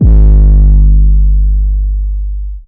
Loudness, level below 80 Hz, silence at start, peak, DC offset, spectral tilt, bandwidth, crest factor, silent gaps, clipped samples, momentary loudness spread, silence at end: -10 LUFS; -6 dBFS; 0 s; 0 dBFS; under 0.1%; -13.5 dB/octave; 1.1 kHz; 6 dB; none; 5%; 11 LU; 0.05 s